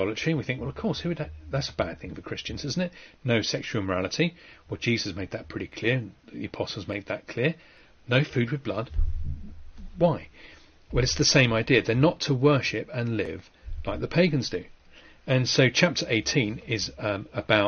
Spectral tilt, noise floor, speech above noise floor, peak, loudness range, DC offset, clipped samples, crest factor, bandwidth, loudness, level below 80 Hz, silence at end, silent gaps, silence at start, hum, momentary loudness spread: -4.5 dB/octave; -52 dBFS; 26 dB; -4 dBFS; 6 LU; under 0.1%; under 0.1%; 22 dB; 6.8 kHz; -26 LUFS; -40 dBFS; 0 s; none; 0 s; none; 15 LU